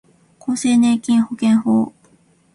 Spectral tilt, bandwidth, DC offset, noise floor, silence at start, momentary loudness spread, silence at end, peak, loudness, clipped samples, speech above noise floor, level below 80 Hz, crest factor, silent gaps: -5 dB/octave; 11.5 kHz; under 0.1%; -55 dBFS; 0.45 s; 10 LU; 0.65 s; -6 dBFS; -17 LUFS; under 0.1%; 39 dB; -60 dBFS; 12 dB; none